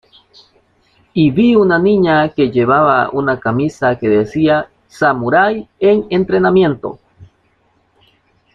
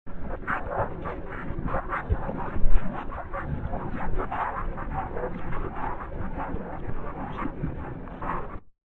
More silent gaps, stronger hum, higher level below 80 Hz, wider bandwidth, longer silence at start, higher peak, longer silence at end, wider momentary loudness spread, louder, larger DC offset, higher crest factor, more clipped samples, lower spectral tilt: neither; neither; second, -50 dBFS vs -32 dBFS; first, 7.4 kHz vs 3.6 kHz; first, 1.15 s vs 0.05 s; about the same, -2 dBFS vs -4 dBFS; first, 1.3 s vs 0.05 s; about the same, 6 LU vs 6 LU; first, -13 LUFS vs -33 LUFS; neither; second, 12 dB vs 22 dB; neither; second, -8 dB/octave vs -9.5 dB/octave